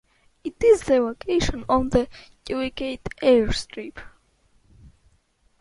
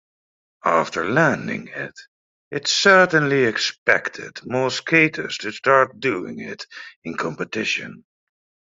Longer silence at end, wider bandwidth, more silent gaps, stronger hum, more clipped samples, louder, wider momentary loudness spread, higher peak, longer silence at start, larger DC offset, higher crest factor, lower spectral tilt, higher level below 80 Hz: first, 1.55 s vs 0.75 s; first, 11.5 kHz vs 7.8 kHz; second, none vs 2.08-2.51 s, 3.78-3.86 s, 6.96-7.02 s; neither; neither; second, -22 LUFS vs -19 LUFS; about the same, 18 LU vs 17 LU; second, -6 dBFS vs 0 dBFS; second, 0.45 s vs 0.65 s; neither; about the same, 18 dB vs 20 dB; first, -5.5 dB/octave vs -4 dB/octave; first, -40 dBFS vs -64 dBFS